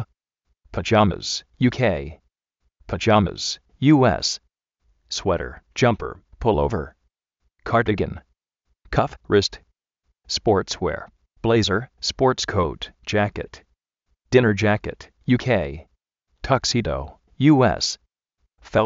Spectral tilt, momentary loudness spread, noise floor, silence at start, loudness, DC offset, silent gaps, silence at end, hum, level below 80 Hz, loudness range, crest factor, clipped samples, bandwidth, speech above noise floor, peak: -4.5 dB/octave; 16 LU; -73 dBFS; 0 s; -21 LUFS; under 0.1%; none; 0 s; none; -42 dBFS; 4 LU; 22 dB; under 0.1%; 8 kHz; 52 dB; -2 dBFS